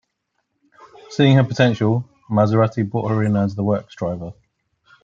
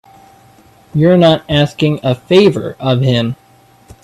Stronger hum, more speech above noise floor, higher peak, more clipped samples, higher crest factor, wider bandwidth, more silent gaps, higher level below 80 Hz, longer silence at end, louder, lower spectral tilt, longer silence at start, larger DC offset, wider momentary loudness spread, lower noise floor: neither; first, 56 dB vs 35 dB; about the same, -2 dBFS vs 0 dBFS; neither; about the same, 18 dB vs 14 dB; second, 7.6 kHz vs 12.5 kHz; neither; second, -58 dBFS vs -46 dBFS; about the same, 0.7 s vs 0.7 s; second, -19 LUFS vs -12 LUFS; about the same, -8 dB/octave vs -7 dB/octave; first, 1.1 s vs 0.95 s; neither; about the same, 12 LU vs 10 LU; first, -73 dBFS vs -46 dBFS